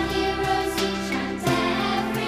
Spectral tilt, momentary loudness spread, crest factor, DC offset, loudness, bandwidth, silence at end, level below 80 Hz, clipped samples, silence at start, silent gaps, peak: -4.5 dB/octave; 3 LU; 14 dB; under 0.1%; -24 LUFS; 15.5 kHz; 0 s; -42 dBFS; under 0.1%; 0 s; none; -10 dBFS